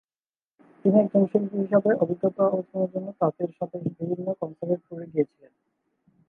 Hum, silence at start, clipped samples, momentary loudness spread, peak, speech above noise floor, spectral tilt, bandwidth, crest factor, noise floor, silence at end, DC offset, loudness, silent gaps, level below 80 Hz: none; 0.85 s; under 0.1%; 10 LU; -6 dBFS; over 65 dB; -12 dB/octave; 2.9 kHz; 20 dB; under -90 dBFS; 1.05 s; under 0.1%; -26 LUFS; none; -74 dBFS